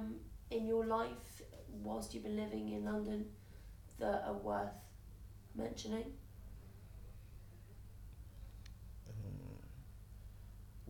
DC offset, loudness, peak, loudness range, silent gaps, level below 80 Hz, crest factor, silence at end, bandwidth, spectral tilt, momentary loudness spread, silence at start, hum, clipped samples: under 0.1%; -43 LUFS; -26 dBFS; 12 LU; none; -56 dBFS; 18 dB; 0 s; 19 kHz; -6 dB/octave; 19 LU; 0 s; none; under 0.1%